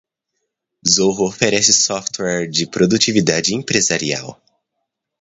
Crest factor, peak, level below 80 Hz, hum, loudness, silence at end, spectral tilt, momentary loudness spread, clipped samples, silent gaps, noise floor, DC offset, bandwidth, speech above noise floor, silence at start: 18 dB; 0 dBFS; -54 dBFS; none; -15 LUFS; 0.85 s; -2.5 dB/octave; 10 LU; under 0.1%; none; -76 dBFS; under 0.1%; 8 kHz; 60 dB; 0.85 s